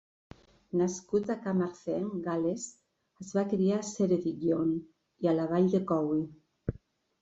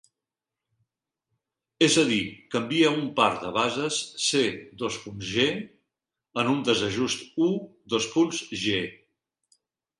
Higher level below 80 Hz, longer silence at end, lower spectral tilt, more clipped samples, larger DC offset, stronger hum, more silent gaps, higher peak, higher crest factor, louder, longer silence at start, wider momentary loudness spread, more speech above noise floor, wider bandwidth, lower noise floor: about the same, -60 dBFS vs -62 dBFS; second, 0.5 s vs 1.05 s; first, -7 dB/octave vs -3.5 dB/octave; neither; neither; neither; neither; second, -16 dBFS vs -8 dBFS; about the same, 16 dB vs 20 dB; second, -31 LUFS vs -25 LUFS; second, 0.75 s vs 1.8 s; first, 13 LU vs 10 LU; second, 28 dB vs 63 dB; second, 8 kHz vs 11.5 kHz; second, -58 dBFS vs -89 dBFS